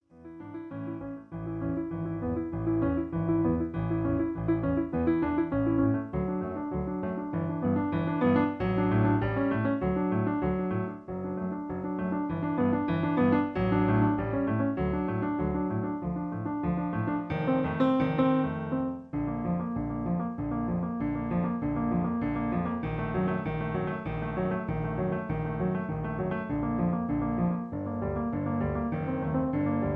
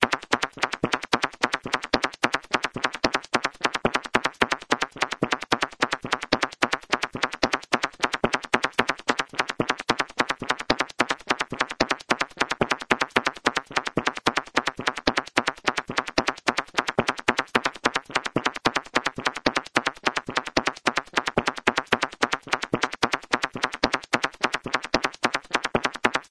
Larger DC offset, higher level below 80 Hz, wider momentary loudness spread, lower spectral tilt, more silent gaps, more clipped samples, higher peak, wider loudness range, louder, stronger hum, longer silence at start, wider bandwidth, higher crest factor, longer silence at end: neither; first, -46 dBFS vs -52 dBFS; first, 8 LU vs 3 LU; first, -11 dB/octave vs -3 dB/octave; neither; neither; second, -12 dBFS vs 0 dBFS; first, 4 LU vs 1 LU; second, -30 LUFS vs -25 LUFS; neither; first, 0.15 s vs 0 s; second, 4.7 kHz vs 11 kHz; second, 16 dB vs 26 dB; about the same, 0 s vs 0.1 s